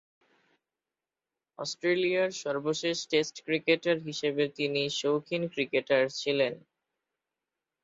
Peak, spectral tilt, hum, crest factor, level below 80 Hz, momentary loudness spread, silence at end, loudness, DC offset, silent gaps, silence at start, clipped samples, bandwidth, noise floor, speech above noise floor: -12 dBFS; -4 dB/octave; none; 20 dB; -76 dBFS; 5 LU; 1.25 s; -29 LUFS; under 0.1%; none; 1.6 s; under 0.1%; 8 kHz; under -90 dBFS; over 61 dB